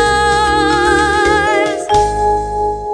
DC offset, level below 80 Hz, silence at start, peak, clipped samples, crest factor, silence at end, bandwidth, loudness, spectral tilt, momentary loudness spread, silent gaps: under 0.1%; -28 dBFS; 0 s; 0 dBFS; under 0.1%; 12 dB; 0 s; 10.5 kHz; -13 LUFS; -4 dB/octave; 4 LU; none